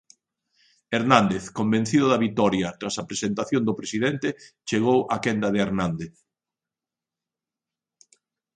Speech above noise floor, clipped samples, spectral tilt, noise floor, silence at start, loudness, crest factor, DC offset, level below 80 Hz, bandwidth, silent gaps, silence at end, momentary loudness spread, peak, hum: 66 dB; under 0.1%; -5.5 dB/octave; -89 dBFS; 0.9 s; -24 LUFS; 24 dB; under 0.1%; -58 dBFS; 10 kHz; none; 2.45 s; 10 LU; 0 dBFS; none